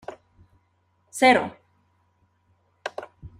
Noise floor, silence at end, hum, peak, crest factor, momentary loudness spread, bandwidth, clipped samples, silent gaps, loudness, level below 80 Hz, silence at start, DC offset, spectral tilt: -68 dBFS; 0.1 s; none; -4 dBFS; 24 dB; 22 LU; 15 kHz; under 0.1%; none; -22 LUFS; -62 dBFS; 0.1 s; under 0.1%; -3.5 dB/octave